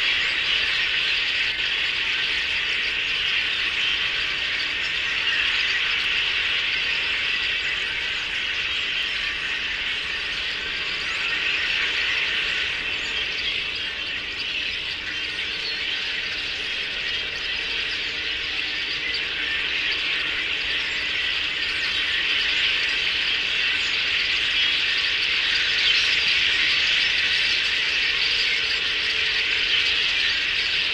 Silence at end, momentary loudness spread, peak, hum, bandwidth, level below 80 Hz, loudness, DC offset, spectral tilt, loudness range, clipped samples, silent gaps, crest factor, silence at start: 0 s; 6 LU; -8 dBFS; none; 15.5 kHz; -50 dBFS; -21 LUFS; under 0.1%; -0.5 dB/octave; 6 LU; under 0.1%; none; 16 dB; 0 s